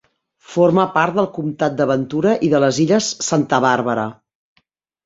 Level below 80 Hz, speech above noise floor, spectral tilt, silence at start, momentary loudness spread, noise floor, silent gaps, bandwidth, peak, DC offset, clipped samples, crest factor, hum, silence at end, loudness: -58 dBFS; 48 dB; -5 dB/octave; 0.5 s; 7 LU; -65 dBFS; none; 7.8 kHz; -2 dBFS; under 0.1%; under 0.1%; 16 dB; none; 0.95 s; -17 LUFS